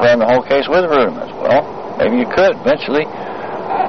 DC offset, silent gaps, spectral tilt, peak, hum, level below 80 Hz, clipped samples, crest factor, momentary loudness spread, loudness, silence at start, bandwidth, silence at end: 1%; none; -3.5 dB/octave; -2 dBFS; none; -46 dBFS; under 0.1%; 12 dB; 11 LU; -15 LUFS; 0 s; 6.4 kHz; 0 s